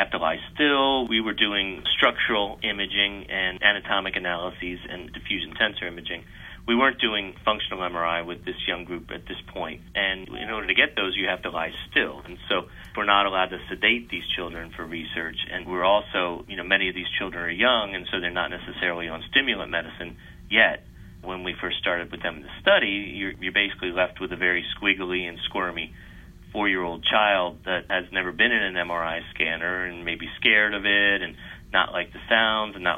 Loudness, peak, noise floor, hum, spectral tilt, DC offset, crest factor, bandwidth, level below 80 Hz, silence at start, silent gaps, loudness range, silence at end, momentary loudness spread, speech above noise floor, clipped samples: -24 LUFS; -2 dBFS; -45 dBFS; none; -5 dB/octave; under 0.1%; 22 dB; 16 kHz; -48 dBFS; 0 s; none; 4 LU; 0 s; 13 LU; 19 dB; under 0.1%